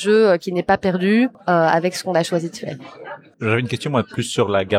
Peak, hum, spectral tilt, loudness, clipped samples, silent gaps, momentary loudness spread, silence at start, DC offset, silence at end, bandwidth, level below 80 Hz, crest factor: -2 dBFS; none; -5.5 dB/octave; -19 LUFS; under 0.1%; none; 15 LU; 0 s; under 0.1%; 0 s; 15.5 kHz; -56 dBFS; 16 dB